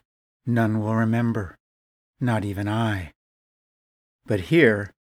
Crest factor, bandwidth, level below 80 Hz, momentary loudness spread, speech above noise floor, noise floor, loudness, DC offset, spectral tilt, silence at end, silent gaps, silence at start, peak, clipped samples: 22 dB; 15 kHz; -54 dBFS; 14 LU; over 68 dB; under -90 dBFS; -23 LUFS; under 0.1%; -7.5 dB/octave; 0.15 s; 1.60-2.14 s, 3.15-4.19 s; 0.45 s; -4 dBFS; under 0.1%